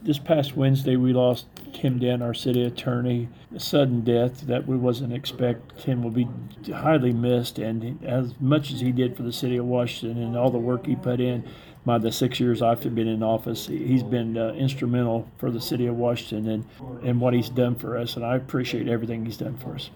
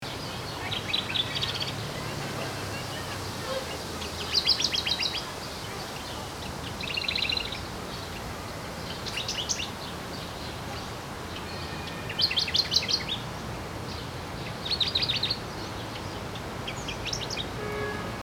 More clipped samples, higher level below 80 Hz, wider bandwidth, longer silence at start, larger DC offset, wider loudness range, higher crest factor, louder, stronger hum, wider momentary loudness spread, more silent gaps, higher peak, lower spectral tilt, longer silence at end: neither; second, -56 dBFS vs -50 dBFS; about the same, over 20 kHz vs over 20 kHz; about the same, 0 s vs 0 s; neither; second, 2 LU vs 6 LU; second, 16 dB vs 22 dB; first, -25 LUFS vs -30 LUFS; neither; second, 9 LU vs 12 LU; neither; about the same, -8 dBFS vs -10 dBFS; first, -7 dB/octave vs -3 dB/octave; about the same, 0 s vs 0 s